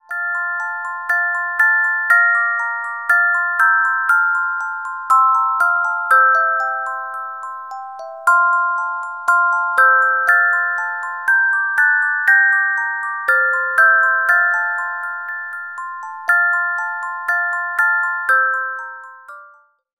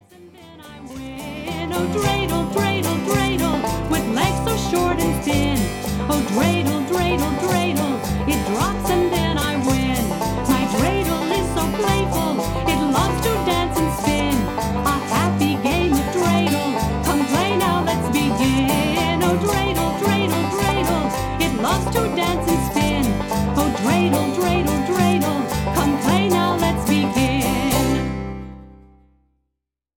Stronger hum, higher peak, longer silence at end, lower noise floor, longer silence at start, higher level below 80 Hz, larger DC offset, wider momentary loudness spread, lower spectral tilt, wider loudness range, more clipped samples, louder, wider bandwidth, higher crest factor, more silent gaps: neither; about the same, -2 dBFS vs -4 dBFS; second, 0.5 s vs 1.2 s; second, -49 dBFS vs -80 dBFS; about the same, 0.1 s vs 0.2 s; second, -74 dBFS vs -32 dBFS; first, 0.1% vs under 0.1%; first, 14 LU vs 4 LU; second, 1 dB/octave vs -5 dB/octave; first, 5 LU vs 2 LU; neither; first, -15 LUFS vs -20 LUFS; about the same, 16.5 kHz vs 18 kHz; about the same, 16 dB vs 16 dB; neither